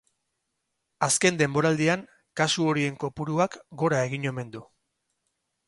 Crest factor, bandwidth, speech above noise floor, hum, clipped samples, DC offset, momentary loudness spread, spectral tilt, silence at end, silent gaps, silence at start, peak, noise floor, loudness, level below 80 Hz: 20 dB; 12 kHz; 54 dB; none; under 0.1%; under 0.1%; 12 LU; -4 dB/octave; 1.05 s; none; 1 s; -6 dBFS; -80 dBFS; -25 LUFS; -64 dBFS